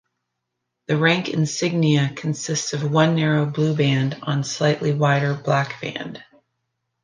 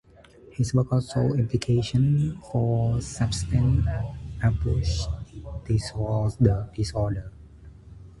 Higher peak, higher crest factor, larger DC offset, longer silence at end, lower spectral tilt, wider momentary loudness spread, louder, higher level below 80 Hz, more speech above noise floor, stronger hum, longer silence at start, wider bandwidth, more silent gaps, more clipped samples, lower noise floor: about the same, -4 dBFS vs -6 dBFS; about the same, 18 dB vs 18 dB; neither; first, 0.8 s vs 0.1 s; second, -5.5 dB/octave vs -7 dB/octave; about the same, 10 LU vs 10 LU; first, -21 LUFS vs -25 LUFS; second, -64 dBFS vs -36 dBFS; first, 59 dB vs 27 dB; neither; first, 0.9 s vs 0.5 s; second, 9.8 kHz vs 11.5 kHz; neither; neither; first, -79 dBFS vs -51 dBFS